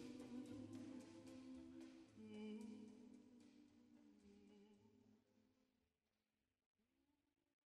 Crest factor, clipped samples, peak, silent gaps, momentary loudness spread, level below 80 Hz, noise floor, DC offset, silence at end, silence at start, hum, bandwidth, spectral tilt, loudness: 16 dB; under 0.1%; -46 dBFS; 6.66-6.75 s; 12 LU; -88 dBFS; under -90 dBFS; under 0.1%; 0.65 s; 0 s; none; 13 kHz; -6 dB/octave; -59 LUFS